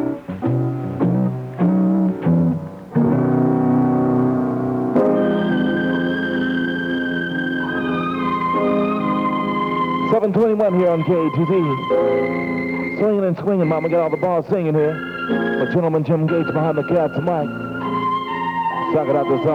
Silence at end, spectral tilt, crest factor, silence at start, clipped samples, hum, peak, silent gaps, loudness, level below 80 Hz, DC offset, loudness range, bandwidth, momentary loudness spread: 0 s; -9 dB/octave; 12 dB; 0 s; under 0.1%; none; -8 dBFS; none; -19 LUFS; -54 dBFS; under 0.1%; 2 LU; 6 kHz; 5 LU